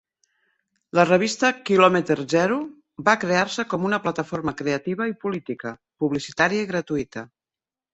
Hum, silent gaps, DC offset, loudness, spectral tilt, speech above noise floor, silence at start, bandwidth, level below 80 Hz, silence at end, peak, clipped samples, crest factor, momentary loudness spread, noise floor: none; none; under 0.1%; -22 LUFS; -5 dB/octave; over 68 dB; 0.95 s; 8.2 kHz; -60 dBFS; 0.7 s; -2 dBFS; under 0.1%; 22 dB; 12 LU; under -90 dBFS